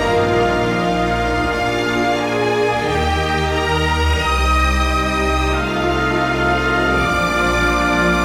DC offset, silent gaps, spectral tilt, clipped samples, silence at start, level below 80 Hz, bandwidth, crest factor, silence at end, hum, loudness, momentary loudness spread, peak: under 0.1%; none; -5 dB/octave; under 0.1%; 0 s; -24 dBFS; 16.5 kHz; 12 dB; 0 s; none; -17 LUFS; 2 LU; -4 dBFS